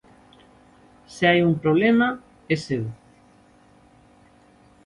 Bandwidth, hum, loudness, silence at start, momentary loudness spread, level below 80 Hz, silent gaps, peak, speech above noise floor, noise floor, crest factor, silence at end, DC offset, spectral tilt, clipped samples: 11 kHz; none; -21 LUFS; 1.1 s; 17 LU; -58 dBFS; none; -6 dBFS; 34 dB; -55 dBFS; 18 dB; 1.9 s; under 0.1%; -6.5 dB/octave; under 0.1%